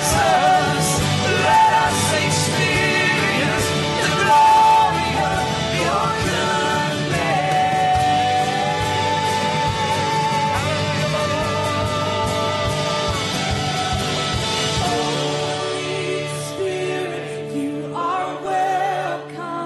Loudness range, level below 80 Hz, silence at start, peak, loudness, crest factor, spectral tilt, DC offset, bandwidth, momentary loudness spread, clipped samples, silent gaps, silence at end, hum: 7 LU; -40 dBFS; 0 s; -6 dBFS; -19 LUFS; 14 dB; -4 dB/octave; under 0.1%; 12.5 kHz; 9 LU; under 0.1%; none; 0 s; none